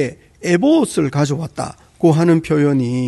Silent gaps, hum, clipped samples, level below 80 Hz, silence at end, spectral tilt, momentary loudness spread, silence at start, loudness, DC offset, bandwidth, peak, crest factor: none; none; under 0.1%; -50 dBFS; 0 s; -7 dB/octave; 12 LU; 0 s; -16 LUFS; under 0.1%; 12 kHz; -2 dBFS; 14 dB